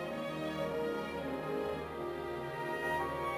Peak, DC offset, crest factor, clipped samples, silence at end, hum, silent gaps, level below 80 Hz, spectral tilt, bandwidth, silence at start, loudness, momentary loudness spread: -24 dBFS; under 0.1%; 14 dB; under 0.1%; 0 s; none; none; -58 dBFS; -6 dB/octave; 16 kHz; 0 s; -38 LUFS; 5 LU